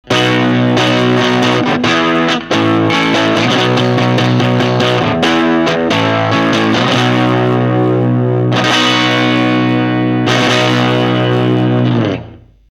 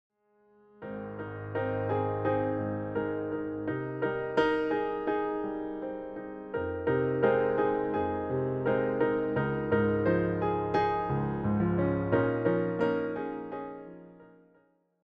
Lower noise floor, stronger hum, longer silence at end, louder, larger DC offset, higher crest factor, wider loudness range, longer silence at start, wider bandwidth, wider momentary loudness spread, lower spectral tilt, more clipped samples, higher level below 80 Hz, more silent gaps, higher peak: second, -33 dBFS vs -67 dBFS; neither; second, 0.35 s vs 0.8 s; first, -11 LUFS vs -30 LUFS; neither; about the same, 12 dB vs 16 dB; second, 0 LU vs 4 LU; second, 0.05 s vs 0.8 s; first, 11.5 kHz vs 6.2 kHz; second, 2 LU vs 12 LU; second, -5.5 dB/octave vs -9.5 dB/octave; neither; first, -46 dBFS vs -56 dBFS; neither; first, 0 dBFS vs -14 dBFS